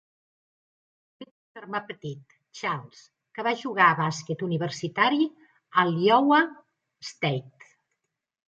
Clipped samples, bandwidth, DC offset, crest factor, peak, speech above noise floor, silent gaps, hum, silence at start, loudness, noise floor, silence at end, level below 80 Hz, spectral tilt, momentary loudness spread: under 0.1%; 8.8 kHz; under 0.1%; 22 dB; -6 dBFS; 58 dB; 1.31-1.55 s; none; 1.2 s; -25 LUFS; -83 dBFS; 1 s; -76 dBFS; -5.5 dB/octave; 20 LU